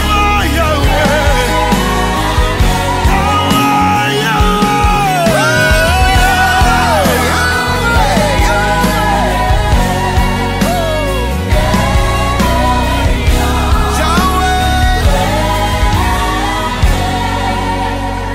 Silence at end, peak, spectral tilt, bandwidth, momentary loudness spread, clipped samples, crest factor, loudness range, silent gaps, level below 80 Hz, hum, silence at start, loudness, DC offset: 0 s; 0 dBFS; -4.5 dB/octave; 16.5 kHz; 5 LU; under 0.1%; 10 dB; 3 LU; none; -16 dBFS; none; 0 s; -12 LUFS; under 0.1%